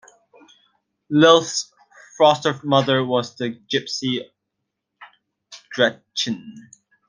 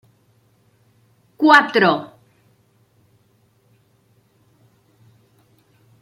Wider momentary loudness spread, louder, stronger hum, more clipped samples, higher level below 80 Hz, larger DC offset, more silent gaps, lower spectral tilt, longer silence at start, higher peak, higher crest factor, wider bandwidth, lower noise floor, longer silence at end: about the same, 14 LU vs 15 LU; second, -19 LUFS vs -15 LUFS; neither; neither; about the same, -70 dBFS vs -74 dBFS; neither; neither; about the same, -4 dB/octave vs -5 dB/octave; second, 1.1 s vs 1.4 s; about the same, -2 dBFS vs 0 dBFS; about the same, 20 dB vs 24 dB; second, 10 kHz vs 15 kHz; first, -79 dBFS vs -60 dBFS; second, 0.5 s vs 3.95 s